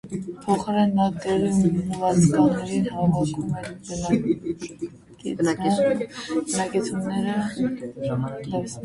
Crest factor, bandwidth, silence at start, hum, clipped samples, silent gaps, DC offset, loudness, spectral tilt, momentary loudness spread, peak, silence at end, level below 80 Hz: 16 dB; 11.5 kHz; 0.05 s; none; under 0.1%; none; under 0.1%; -24 LUFS; -6.5 dB/octave; 12 LU; -8 dBFS; 0 s; -52 dBFS